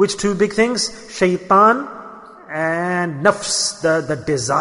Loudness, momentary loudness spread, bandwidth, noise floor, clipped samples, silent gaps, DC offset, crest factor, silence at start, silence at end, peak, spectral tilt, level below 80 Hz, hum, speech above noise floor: -17 LUFS; 11 LU; 11 kHz; -38 dBFS; under 0.1%; none; under 0.1%; 16 dB; 0 s; 0 s; -2 dBFS; -3.5 dB/octave; -52 dBFS; none; 21 dB